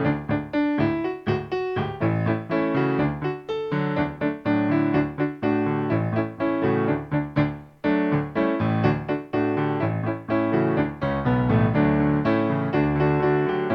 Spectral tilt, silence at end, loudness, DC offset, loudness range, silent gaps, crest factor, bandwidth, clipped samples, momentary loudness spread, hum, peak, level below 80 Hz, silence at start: -9.5 dB/octave; 0 s; -24 LUFS; under 0.1%; 3 LU; none; 16 dB; 6 kHz; under 0.1%; 6 LU; none; -8 dBFS; -48 dBFS; 0 s